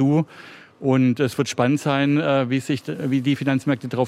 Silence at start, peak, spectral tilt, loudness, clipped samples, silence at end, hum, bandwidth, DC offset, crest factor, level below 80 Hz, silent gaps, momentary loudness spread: 0 s; -6 dBFS; -6.5 dB/octave; -21 LUFS; under 0.1%; 0 s; none; 14 kHz; under 0.1%; 16 dB; -64 dBFS; none; 7 LU